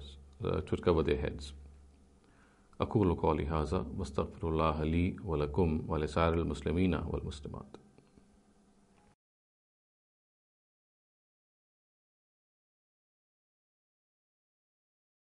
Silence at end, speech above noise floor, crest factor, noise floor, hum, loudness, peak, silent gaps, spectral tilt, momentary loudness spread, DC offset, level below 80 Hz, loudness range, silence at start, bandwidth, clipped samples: 7.6 s; 33 dB; 22 dB; -66 dBFS; none; -33 LUFS; -14 dBFS; none; -8 dB/octave; 15 LU; under 0.1%; -48 dBFS; 7 LU; 0 s; 11 kHz; under 0.1%